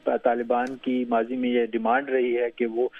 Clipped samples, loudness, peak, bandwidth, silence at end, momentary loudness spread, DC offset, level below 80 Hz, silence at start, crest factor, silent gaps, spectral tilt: under 0.1%; -25 LUFS; -8 dBFS; 6.6 kHz; 0 s; 3 LU; under 0.1%; -66 dBFS; 0.05 s; 16 dB; none; -6.5 dB/octave